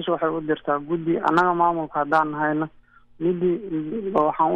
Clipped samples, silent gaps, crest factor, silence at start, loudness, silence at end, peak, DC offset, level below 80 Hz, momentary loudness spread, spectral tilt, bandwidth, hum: under 0.1%; none; 16 dB; 0 s; -23 LUFS; 0 s; -6 dBFS; under 0.1%; -58 dBFS; 8 LU; -8 dB/octave; 8.4 kHz; none